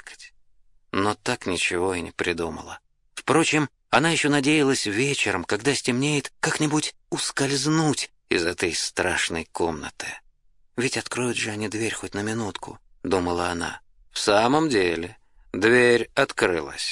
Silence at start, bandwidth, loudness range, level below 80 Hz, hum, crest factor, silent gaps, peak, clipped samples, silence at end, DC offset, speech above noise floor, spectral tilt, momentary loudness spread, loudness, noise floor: 0.05 s; 11.5 kHz; 6 LU; -56 dBFS; none; 24 dB; none; -2 dBFS; under 0.1%; 0 s; under 0.1%; 35 dB; -3.5 dB/octave; 14 LU; -23 LUFS; -58 dBFS